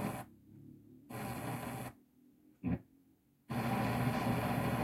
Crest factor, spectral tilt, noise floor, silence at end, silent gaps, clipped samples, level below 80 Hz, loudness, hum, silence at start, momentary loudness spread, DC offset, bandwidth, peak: 18 dB; -6.5 dB/octave; -70 dBFS; 0 s; none; under 0.1%; -60 dBFS; -39 LUFS; none; 0 s; 23 LU; under 0.1%; 16.5 kHz; -22 dBFS